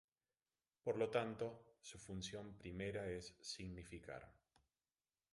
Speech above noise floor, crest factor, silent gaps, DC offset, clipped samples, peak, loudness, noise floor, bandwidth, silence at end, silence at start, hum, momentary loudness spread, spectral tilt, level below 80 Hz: over 43 dB; 24 dB; none; under 0.1%; under 0.1%; -26 dBFS; -48 LUFS; under -90 dBFS; 11.5 kHz; 1 s; 0.85 s; none; 16 LU; -5 dB/octave; -68 dBFS